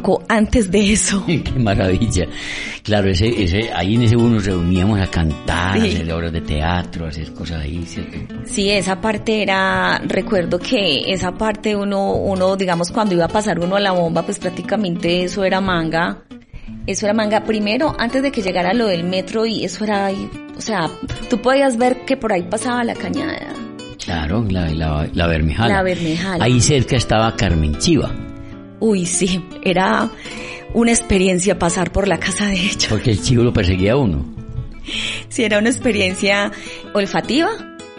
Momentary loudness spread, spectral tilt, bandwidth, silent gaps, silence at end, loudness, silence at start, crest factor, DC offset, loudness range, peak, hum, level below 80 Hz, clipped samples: 11 LU; -5 dB/octave; 11 kHz; none; 0 s; -17 LUFS; 0 s; 16 dB; under 0.1%; 3 LU; -2 dBFS; none; -32 dBFS; under 0.1%